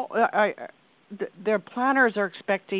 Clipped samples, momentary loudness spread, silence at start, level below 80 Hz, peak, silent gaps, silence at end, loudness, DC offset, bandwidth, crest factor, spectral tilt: under 0.1%; 15 LU; 0 s; -78 dBFS; -8 dBFS; none; 0 s; -24 LUFS; under 0.1%; 4 kHz; 18 dB; -9 dB/octave